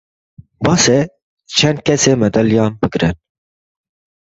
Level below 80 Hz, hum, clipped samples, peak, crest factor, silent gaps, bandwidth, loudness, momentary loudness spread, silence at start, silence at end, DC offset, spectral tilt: -42 dBFS; none; under 0.1%; 0 dBFS; 16 dB; 1.22-1.37 s; 8.2 kHz; -14 LUFS; 7 LU; 0.6 s; 1.1 s; under 0.1%; -4.5 dB/octave